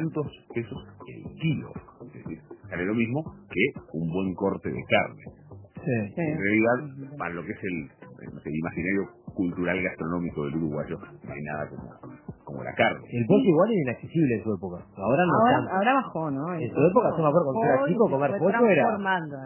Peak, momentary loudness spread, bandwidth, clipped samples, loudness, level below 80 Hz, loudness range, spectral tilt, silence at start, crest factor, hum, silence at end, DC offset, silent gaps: -6 dBFS; 20 LU; 3.2 kHz; under 0.1%; -26 LUFS; -56 dBFS; 8 LU; -11 dB/octave; 0 s; 20 dB; none; 0 s; under 0.1%; none